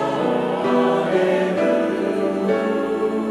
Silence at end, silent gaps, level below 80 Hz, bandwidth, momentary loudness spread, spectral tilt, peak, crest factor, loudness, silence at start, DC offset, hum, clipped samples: 0 s; none; -60 dBFS; 12.5 kHz; 3 LU; -6.5 dB/octave; -6 dBFS; 14 dB; -20 LUFS; 0 s; under 0.1%; none; under 0.1%